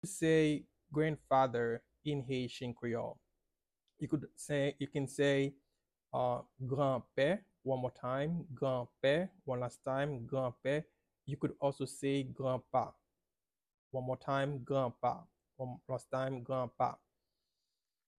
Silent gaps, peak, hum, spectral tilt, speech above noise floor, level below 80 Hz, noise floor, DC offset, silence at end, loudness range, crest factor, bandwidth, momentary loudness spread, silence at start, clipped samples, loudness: 13.74-13.91 s; -18 dBFS; none; -6 dB/octave; over 54 dB; -70 dBFS; under -90 dBFS; under 0.1%; 1.25 s; 4 LU; 18 dB; 13 kHz; 10 LU; 0.05 s; under 0.1%; -37 LUFS